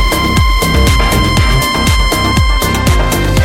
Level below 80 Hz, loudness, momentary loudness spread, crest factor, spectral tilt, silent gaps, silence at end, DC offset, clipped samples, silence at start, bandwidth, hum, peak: -14 dBFS; -11 LUFS; 2 LU; 10 dB; -4.5 dB/octave; none; 0 s; under 0.1%; under 0.1%; 0 s; 17 kHz; none; 0 dBFS